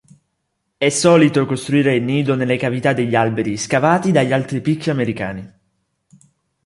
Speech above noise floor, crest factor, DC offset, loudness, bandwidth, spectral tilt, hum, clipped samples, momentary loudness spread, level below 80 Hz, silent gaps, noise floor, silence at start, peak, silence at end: 56 dB; 16 dB; under 0.1%; -17 LUFS; 11.5 kHz; -5.5 dB/octave; none; under 0.1%; 8 LU; -54 dBFS; none; -72 dBFS; 0.8 s; -2 dBFS; 1.2 s